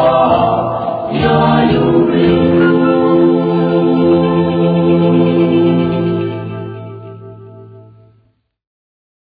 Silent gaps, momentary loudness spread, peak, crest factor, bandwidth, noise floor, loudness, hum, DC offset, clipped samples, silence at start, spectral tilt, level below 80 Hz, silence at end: none; 14 LU; 0 dBFS; 12 dB; 4.9 kHz; -57 dBFS; -12 LUFS; none; under 0.1%; under 0.1%; 0 s; -11 dB/octave; -40 dBFS; 1.45 s